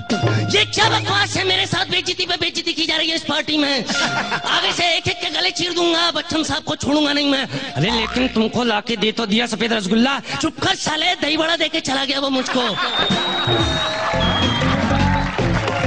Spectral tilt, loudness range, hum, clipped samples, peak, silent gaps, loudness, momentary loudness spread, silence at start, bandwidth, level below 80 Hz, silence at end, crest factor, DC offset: -4 dB/octave; 1 LU; none; under 0.1%; -4 dBFS; none; -18 LUFS; 4 LU; 0 s; 10 kHz; -38 dBFS; 0 s; 14 dB; 0.6%